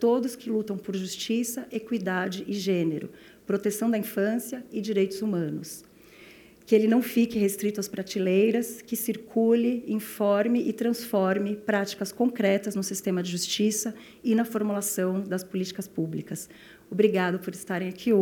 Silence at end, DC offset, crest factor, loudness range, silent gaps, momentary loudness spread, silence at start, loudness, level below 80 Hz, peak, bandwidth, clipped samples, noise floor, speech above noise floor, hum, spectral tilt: 0 s; under 0.1%; 18 dB; 4 LU; none; 10 LU; 0 s; -27 LUFS; -70 dBFS; -8 dBFS; 19.5 kHz; under 0.1%; -51 dBFS; 25 dB; none; -5 dB/octave